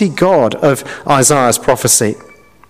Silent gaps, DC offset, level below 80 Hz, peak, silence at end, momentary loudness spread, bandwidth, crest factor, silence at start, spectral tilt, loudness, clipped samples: none; under 0.1%; -44 dBFS; 0 dBFS; 0.5 s; 9 LU; 16 kHz; 12 dB; 0 s; -3.5 dB/octave; -11 LUFS; under 0.1%